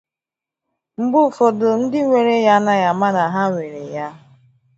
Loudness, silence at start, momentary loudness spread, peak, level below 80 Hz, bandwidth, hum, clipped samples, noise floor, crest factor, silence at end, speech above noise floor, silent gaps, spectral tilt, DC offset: -16 LUFS; 1 s; 14 LU; -2 dBFS; -66 dBFS; 8 kHz; none; under 0.1%; -88 dBFS; 16 dB; 0.6 s; 72 dB; none; -6.5 dB/octave; under 0.1%